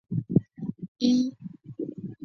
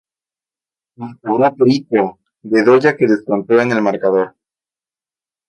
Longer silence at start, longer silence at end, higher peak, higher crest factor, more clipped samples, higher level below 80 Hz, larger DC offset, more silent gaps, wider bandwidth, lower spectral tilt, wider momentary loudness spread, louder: second, 0.1 s vs 1 s; second, 0 s vs 1.2 s; second, -8 dBFS vs 0 dBFS; about the same, 20 dB vs 16 dB; neither; about the same, -62 dBFS vs -64 dBFS; neither; first, 0.88-0.95 s vs none; second, 6.8 kHz vs 8.6 kHz; about the same, -7.5 dB/octave vs -7 dB/octave; first, 15 LU vs 12 LU; second, -28 LUFS vs -15 LUFS